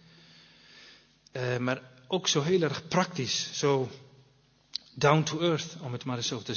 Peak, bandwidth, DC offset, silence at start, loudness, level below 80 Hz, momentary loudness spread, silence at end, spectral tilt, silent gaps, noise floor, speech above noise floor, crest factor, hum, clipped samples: -8 dBFS; 7 kHz; under 0.1%; 0.75 s; -29 LUFS; -68 dBFS; 13 LU; 0 s; -4.5 dB/octave; none; -64 dBFS; 35 dB; 22 dB; 50 Hz at -60 dBFS; under 0.1%